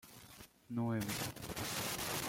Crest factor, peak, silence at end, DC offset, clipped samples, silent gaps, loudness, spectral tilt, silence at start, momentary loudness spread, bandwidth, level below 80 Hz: 14 dB; -28 dBFS; 0 s; under 0.1%; under 0.1%; none; -40 LUFS; -3.5 dB/octave; 0.05 s; 17 LU; 16.5 kHz; -64 dBFS